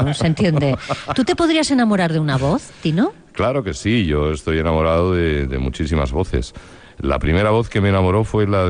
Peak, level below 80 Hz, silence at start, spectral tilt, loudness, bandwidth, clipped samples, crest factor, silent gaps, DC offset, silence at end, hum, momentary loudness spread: -4 dBFS; -32 dBFS; 0 s; -6.5 dB/octave; -18 LUFS; 10 kHz; under 0.1%; 14 dB; none; under 0.1%; 0 s; none; 6 LU